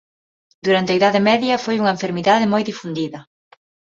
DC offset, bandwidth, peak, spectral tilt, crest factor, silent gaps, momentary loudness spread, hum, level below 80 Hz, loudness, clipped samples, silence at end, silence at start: under 0.1%; 7.8 kHz; -2 dBFS; -5.5 dB/octave; 18 dB; none; 11 LU; none; -62 dBFS; -18 LUFS; under 0.1%; 0.75 s; 0.65 s